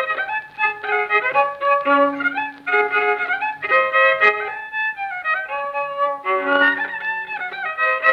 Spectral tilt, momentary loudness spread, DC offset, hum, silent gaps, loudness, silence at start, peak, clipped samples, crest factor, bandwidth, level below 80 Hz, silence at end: -4 dB/octave; 9 LU; under 0.1%; none; none; -19 LUFS; 0 s; -2 dBFS; under 0.1%; 18 dB; 6.8 kHz; -68 dBFS; 0 s